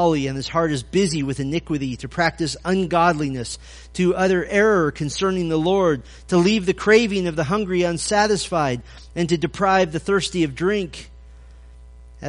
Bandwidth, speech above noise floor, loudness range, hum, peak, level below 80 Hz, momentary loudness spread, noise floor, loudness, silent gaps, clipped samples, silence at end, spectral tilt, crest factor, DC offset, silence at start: 10.5 kHz; 22 dB; 3 LU; none; -2 dBFS; -42 dBFS; 9 LU; -43 dBFS; -20 LUFS; none; under 0.1%; 0 s; -5 dB/octave; 18 dB; under 0.1%; 0 s